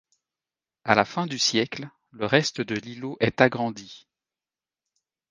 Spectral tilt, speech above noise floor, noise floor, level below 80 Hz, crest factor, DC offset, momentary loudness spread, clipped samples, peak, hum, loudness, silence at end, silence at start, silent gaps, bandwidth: -4 dB/octave; over 65 dB; under -90 dBFS; -64 dBFS; 26 dB; under 0.1%; 16 LU; under 0.1%; 0 dBFS; none; -24 LUFS; 1.3 s; 0.85 s; none; 10.5 kHz